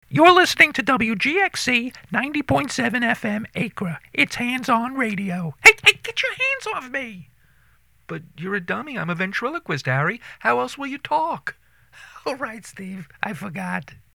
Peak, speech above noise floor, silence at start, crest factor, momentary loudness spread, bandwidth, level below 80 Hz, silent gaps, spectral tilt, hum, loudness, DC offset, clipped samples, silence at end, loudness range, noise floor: 0 dBFS; 38 dB; 0.1 s; 22 dB; 17 LU; over 20 kHz; -54 dBFS; none; -4 dB/octave; none; -20 LUFS; under 0.1%; under 0.1%; 0.2 s; 9 LU; -59 dBFS